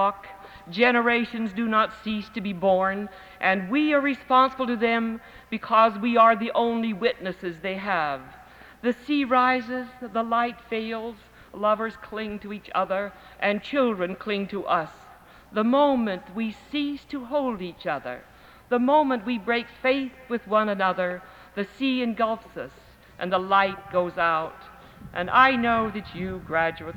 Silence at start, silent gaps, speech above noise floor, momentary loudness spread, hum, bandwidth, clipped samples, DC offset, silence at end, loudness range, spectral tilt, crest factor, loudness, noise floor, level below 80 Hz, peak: 0 s; none; 25 dB; 14 LU; none; 17.5 kHz; under 0.1%; under 0.1%; 0 s; 5 LU; -6.5 dB/octave; 22 dB; -24 LUFS; -50 dBFS; -56 dBFS; -4 dBFS